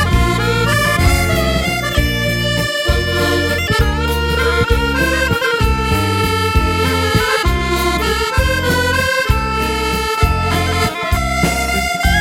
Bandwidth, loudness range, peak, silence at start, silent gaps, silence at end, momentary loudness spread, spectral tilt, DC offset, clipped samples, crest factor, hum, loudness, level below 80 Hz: 16.5 kHz; 1 LU; 0 dBFS; 0 s; none; 0 s; 2 LU; -4.5 dB/octave; under 0.1%; under 0.1%; 14 dB; none; -15 LUFS; -22 dBFS